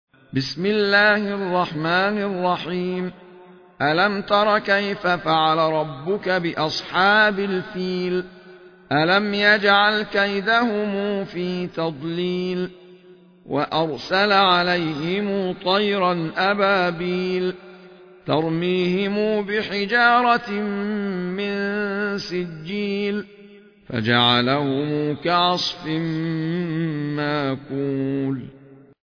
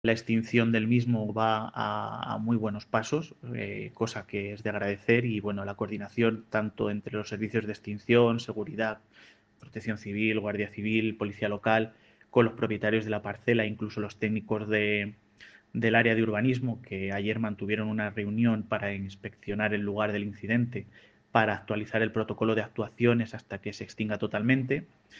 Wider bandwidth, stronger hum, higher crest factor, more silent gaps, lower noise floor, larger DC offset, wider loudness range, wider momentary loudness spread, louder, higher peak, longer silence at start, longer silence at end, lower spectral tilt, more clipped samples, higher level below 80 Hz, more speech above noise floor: second, 5.4 kHz vs 7.6 kHz; neither; second, 18 dB vs 24 dB; neither; second, -49 dBFS vs -55 dBFS; neither; about the same, 5 LU vs 3 LU; about the same, 10 LU vs 10 LU; first, -21 LUFS vs -29 LUFS; first, -2 dBFS vs -6 dBFS; first, 0.35 s vs 0.05 s; first, 0.3 s vs 0 s; about the same, -6 dB/octave vs -7 dB/octave; neither; first, -58 dBFS vs -66 dBFS; about the same, 28 dB vs 26 dB